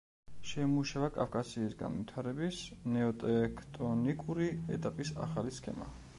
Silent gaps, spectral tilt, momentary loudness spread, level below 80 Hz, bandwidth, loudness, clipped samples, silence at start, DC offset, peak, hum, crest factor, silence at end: none; -6.5 dB/octave; 8 LU; -56 dBFS; 11.5 kHz; -37 LUFS; under 0.1%; 0.25 s; under 0.1%; -18 dBFS; none; 18 dB; 0 s